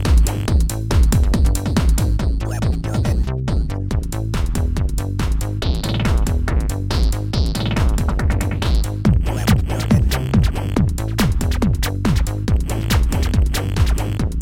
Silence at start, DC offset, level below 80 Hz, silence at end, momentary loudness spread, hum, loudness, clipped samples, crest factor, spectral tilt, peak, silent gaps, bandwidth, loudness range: 0 s; under 0.1%; -20 dBFS; 0 s; 5 LU; none; -19 LUFS; under 0.1%; 14 dB; -6 dB/octave; -2 dBFS; none; 17 kHz; 3 LU